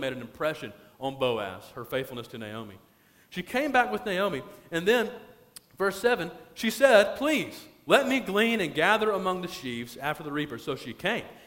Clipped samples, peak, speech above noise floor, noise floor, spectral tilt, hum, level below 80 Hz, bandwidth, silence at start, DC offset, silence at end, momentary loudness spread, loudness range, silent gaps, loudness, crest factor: under 0.1%; -6 dBFS; 25 dB; -53 dBFS; -4 dB/octave; none; -62 dBFS; 16.5 kHz; 0 s; under 0.1%; 0.1 s; 16 LU; 7 LU; none; -27 LUFS; 22 dB